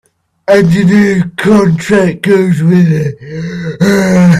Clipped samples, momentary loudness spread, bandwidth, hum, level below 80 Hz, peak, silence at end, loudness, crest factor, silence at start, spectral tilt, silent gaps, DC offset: under 0.1%; 12 LU; 13 kHz; none; -42 dBFS; 0 dBFS; 0 s; -9 LUFS; 8 dB; 0.5 s; -7 dB/octave; none; under 0.1%